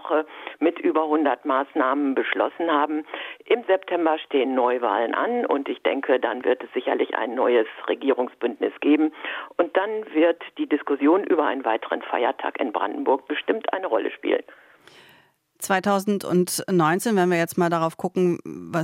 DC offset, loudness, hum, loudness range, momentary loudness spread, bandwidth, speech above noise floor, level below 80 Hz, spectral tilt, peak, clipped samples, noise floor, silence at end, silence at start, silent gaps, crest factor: under 0.1%; -23 LUFS; none; 3 LU; 6 LU; 16 kHz; 35 dB; -76 dBFS; -5.5 dB/octave; -6 dBFS; under 0.1%; -58 dBFS; 0 s; 0 s; none; 18 dB